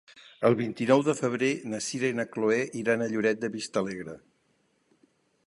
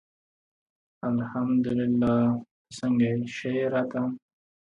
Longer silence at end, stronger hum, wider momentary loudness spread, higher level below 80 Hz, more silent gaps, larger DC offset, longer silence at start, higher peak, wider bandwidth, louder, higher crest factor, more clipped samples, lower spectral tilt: first, 1.3 s vs 0.5 s; neither; about the same, 9 LU vs 10 LU; second, -72 dBFS vs -60 dBFS; second, none vs 2.51-2.65 s; neither; second, 0.15 s vs 1.05 s; first, -8 dBFS vs -12 dBFS; first, 11.5 kHz vs 8.8 kHz; about the same, -28 LUFS vs -27 LUFS; first, 20 dB vs 14 dB; neither; second, -5 dB/octave vs -7.5 dB/octave